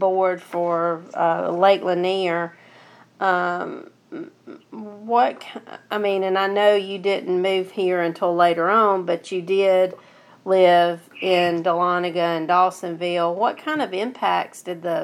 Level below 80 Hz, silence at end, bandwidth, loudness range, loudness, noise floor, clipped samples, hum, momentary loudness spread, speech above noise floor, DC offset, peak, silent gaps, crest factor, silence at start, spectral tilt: -82 dBFS; 0 s; 13.5 kHz; 6 LU; -21 LUFS; -49 dBFS; under 0.1%; none; 16 LU; 29 dB; under 0.1%; -4 dBFS; none; 16 dB; 0 s; -5.5 dB/octave